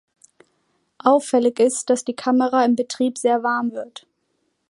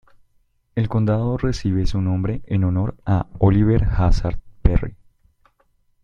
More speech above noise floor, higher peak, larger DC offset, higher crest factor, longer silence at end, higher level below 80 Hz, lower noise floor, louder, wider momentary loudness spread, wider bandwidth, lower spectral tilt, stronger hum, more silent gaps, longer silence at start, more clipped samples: first, 51 dB vs 44 dB; about the same, -2 dBFS vs -2 dBFS; neither; about the same, 18 dB vs 18 dB; second, 0.85 s vs 1.1 s; second, -76 dBFS vs -26 dBFS; first, -70 dBFS vs -62 dBFS; about the same, -20 LUFS vs -21 LUFS; about the same, 7 LU vs 8 LU; first, 11.5 kHz vs 7.4 kHz; second, -3.5 dB/octave vs -8.5 dB/octave; neither; neither; first, 1.05 s vs 0.75 s; neither